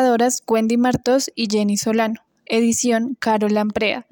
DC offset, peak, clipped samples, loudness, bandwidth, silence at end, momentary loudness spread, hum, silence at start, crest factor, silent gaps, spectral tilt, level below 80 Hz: under 0.1%; -6 dBFS; under 0.1%; -19 LUFS; 17.5 kHz; 0.1 s; 4 LU; none; 0 s; 14 dB; none; -4 dB/octave; -54 dBFS